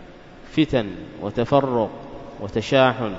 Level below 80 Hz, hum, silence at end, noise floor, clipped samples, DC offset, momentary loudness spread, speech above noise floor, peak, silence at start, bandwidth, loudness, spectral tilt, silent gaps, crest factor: -46 dBFS; none; 0 s; -42 dBFS; under 0.1%; under 0.1%; 16 LU; 21 dB; -2 dBFS; 0 s; 7.8 kHz; -22 LUFS; -6.5 dB/octave; none; 20 dB